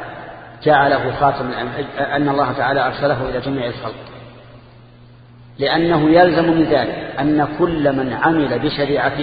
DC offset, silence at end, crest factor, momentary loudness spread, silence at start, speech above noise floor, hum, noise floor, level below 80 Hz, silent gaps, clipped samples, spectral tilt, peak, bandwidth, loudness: under 0.1%; 0 s; 18 dB; 12 LU; 0 s; 27 dB; none; -43 dBFS; -44 dBFS; none; under 0.1%; -9.5 dB/octave; 0 dBFS; 5 kHz; -17 LUFS